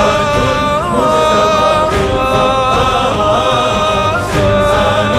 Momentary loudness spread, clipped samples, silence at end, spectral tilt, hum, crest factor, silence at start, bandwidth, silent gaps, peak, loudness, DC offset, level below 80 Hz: 3 LU; under 0.1%; 0 s; -5 dB/octave; none; 12 dB; 0 s; 15 kHz; none; 0 dBFS; -12 LUFS; under 0.1%; -28 dBFS